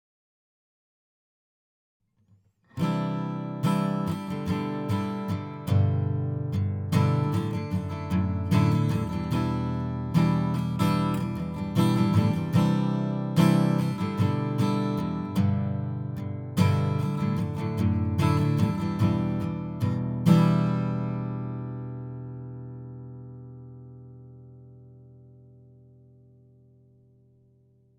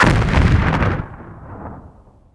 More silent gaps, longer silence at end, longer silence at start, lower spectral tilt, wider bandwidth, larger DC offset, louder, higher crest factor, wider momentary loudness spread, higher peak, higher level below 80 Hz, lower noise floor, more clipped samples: neither; first, 2.7 s vs 0.5 s; first, 2.75 s vs 0 s; first, -8 dB/octave vs -6.5 dB/octave; first, 18.5 kHz vs 11 kHz; neither; second, -26 LUFS vs -16 LUFS; about the same, 20 dB vs 18 dB; second, 15 LU vs 21 LU; second, -8 dBFS vs 0 dBFS; second, -56 dBFS vs -24 dBFS; first, -64 dBFS vs -44 dBFS; neither